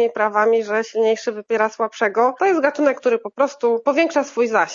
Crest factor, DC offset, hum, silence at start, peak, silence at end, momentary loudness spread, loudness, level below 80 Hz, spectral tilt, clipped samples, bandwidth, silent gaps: 18 dB; under 0.1%; none; 0 s; 0 dBFS; 0 s; 4 LU; -19 LUFS; -80 dBFS; -4 dB/octave; under 0.1%; 7.6 kHz; none